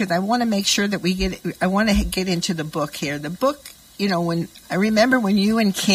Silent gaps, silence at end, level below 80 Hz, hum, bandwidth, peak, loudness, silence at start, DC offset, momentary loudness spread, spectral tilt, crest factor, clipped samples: none; 0 s; -38 dBFS; none; 16 kHz; -4 dBFS; -21 LUFS; 0 s; under 0.1%; 9 LU; -4.5 dB/octave; 18 dB; under 0.1%